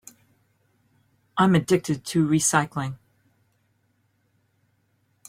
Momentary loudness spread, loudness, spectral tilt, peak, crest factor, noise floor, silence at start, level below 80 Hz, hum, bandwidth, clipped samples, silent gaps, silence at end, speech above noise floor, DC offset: 13 LU; -23 LUFS; -5 dB/octave; -4 dBFS; 22 dB; -68 dBFS; 1.35 s; -62 dBFS; none; 16 kHz; under 0.1%; none; 2.35 s; 47 dB; under 0.1%